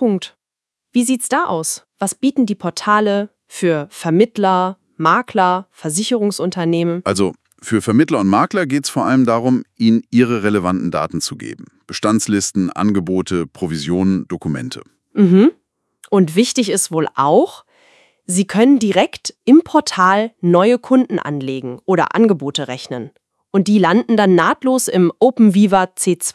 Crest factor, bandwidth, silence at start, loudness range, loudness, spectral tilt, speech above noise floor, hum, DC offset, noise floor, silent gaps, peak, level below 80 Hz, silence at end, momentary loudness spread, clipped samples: 16 dB; 12 kHz; 0 s; 4 LU; -16 LUFS; -5 dB/octave; 69 dB; none; under 0.1%; -84 dBFS; none; 0 dBFS; -60 dBFS; 0.05 s; 10 LU; under 0.1%